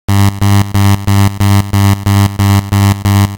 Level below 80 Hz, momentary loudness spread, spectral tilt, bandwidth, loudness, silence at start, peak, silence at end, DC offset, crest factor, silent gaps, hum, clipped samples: -30 dBFS; 1 LU; -6 dB/octave; 17.5 kHz; -10 LUFS; 0.1 s; 0 dBFS; 0 s; 0.3%; 10 dB; none; none; under 0.1%